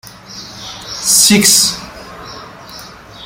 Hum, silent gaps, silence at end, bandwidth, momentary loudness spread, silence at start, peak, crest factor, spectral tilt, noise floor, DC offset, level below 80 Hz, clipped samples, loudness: none; none; 0 s; over 20 kHz; 25 LU; 0.05 s; 0 dBFS; 16 dB; -1.5 dB/octave; -33 dBFS; under 0.1%; -46 dBFS; under 0.1%; -8 LUFS